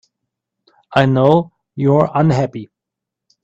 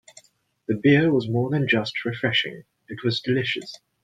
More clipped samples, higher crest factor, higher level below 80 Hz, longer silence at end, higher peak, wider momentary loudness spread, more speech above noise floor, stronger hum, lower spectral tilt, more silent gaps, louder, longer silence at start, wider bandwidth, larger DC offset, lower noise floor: neither; about the same, 16 dB vs 18 dB; first, -50 dBFS vs -62 dBFS; first, 0.8 s vs 0.25 s; first, 0 dBFS vs -6 dBFS; about the same, 12 LU vs 13 LU; first, 69 dB vs 32 dB; neither; first, -8 dB/octave vs -6.5 dB/octave; neither; first, -15 LUFS vs -23 LUFS; first, 0.9 s vs 0.7 s; second, 8 kHz vs 9.4 kHz; neither; first, -82 dBFS vs -54 dBFS